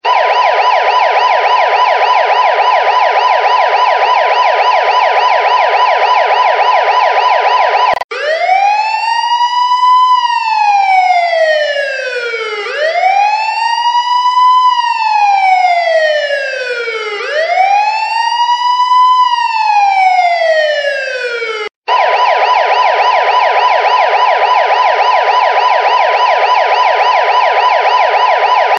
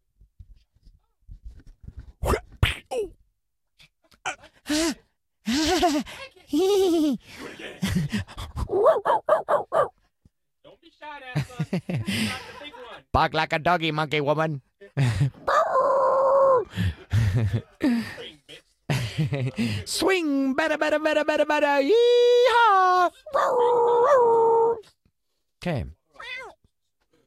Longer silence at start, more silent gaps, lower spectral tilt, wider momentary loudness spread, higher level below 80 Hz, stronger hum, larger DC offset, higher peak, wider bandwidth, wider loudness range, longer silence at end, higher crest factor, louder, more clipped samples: second, 0.05 s vs 1.3 s; first, 8.04-8.09 s, 21.76-21.82 s vs none; second, 0.5 dB/octave vs -5.5 dB/octave; second, 6 LU vs 18 LU; second, -66 dBFS vs -44 dBFS; neither; neither; first, 0 dBFS vs -6 dBFS; second, 9 kHz vs 15.5 kHz; second, 2 LU vs 11 LU; second, 0 s vs 0.75 s; second, 10 dB vs 18 dB; first, -10 LUFS vs -23 LUFS; neither